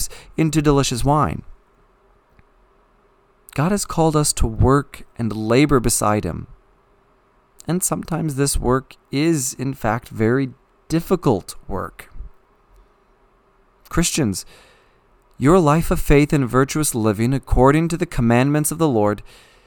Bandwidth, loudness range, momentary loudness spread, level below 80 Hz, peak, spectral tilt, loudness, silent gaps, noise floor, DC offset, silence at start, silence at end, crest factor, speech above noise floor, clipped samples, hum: 19 kHz; 9 LU; 13 LU; -32 dBFS; 0 dBFS; -5.5 dB/octave; -19 LUFS; none; -57 dBFS; under 0.1%; 0 s; 0.45 s; 20 dB; 39 dB; under 0.1%; none